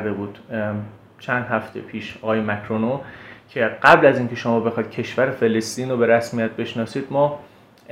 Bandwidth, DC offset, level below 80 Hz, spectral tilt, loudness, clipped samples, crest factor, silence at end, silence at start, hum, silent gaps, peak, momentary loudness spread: 15.5 kHz; under 0.1%; -60 dBFS; -6 dB/octave; -21 LUFS; under 0.1%; 22 dB; 0 s; 0 s; none; none; 0 dBFS; 16 LU